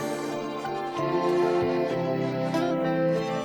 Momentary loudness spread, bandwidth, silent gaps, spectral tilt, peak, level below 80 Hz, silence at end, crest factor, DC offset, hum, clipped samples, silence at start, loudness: 7 LU; 19.5 kHz; none; -6.5 dB/octave; -14 dBFS; -62 dBFS; 0 s; 12 dB; under 0.1%; none; under 0.1%; 0 s; -27 LUFS